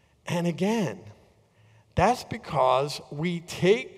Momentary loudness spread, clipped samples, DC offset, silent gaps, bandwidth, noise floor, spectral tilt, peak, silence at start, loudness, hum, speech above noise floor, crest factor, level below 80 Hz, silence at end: 9 LU; under 0.1%; under 0.1%; none; 15 kHz; -59 dBFS; -5.5 dB/octave; -8 dBFS; 0.25 s; -27 LUFS; none; 34 dB; 20 dB; -50 dBFS; 0 s